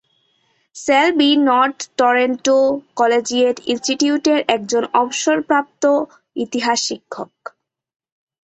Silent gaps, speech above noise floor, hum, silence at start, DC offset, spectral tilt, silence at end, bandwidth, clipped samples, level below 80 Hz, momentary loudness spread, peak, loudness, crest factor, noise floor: none; 46 dB; none; 0.75 s; under 0.1%; -2 dB/octave; 1.2 s; 8.4 kHz; under 0.1%; -64 dBFS; 11 LU; -2 dBFS; -17 LUFS; 16 dB; -63 dBFS